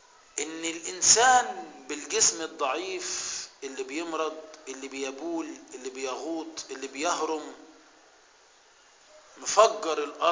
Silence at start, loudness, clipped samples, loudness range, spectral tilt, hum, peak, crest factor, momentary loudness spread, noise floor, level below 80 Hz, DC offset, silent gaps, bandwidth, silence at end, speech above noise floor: 0.35 s; -27 LUFS; under 0.1%; 11 LU; 0 dB/octave; none; -4 dBFS; 26 dB; 17 LU; -58 dBFS; -70 dBFS; under 0.1%; none; 7.8 kHz; 0 s; 31 dB